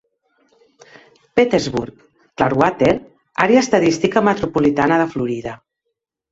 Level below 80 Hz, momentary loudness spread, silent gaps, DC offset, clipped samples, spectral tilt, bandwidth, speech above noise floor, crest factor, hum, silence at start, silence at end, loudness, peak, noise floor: -48 dBFS; 11 LU; none; under 0.1%; under 0.1%; -5.5 dB/octave; 8 kHz; 61 dB; 18 dB; none; 1.35 s; 0.75 s; -17 LUFS; -2 dBFS; -77 dBFS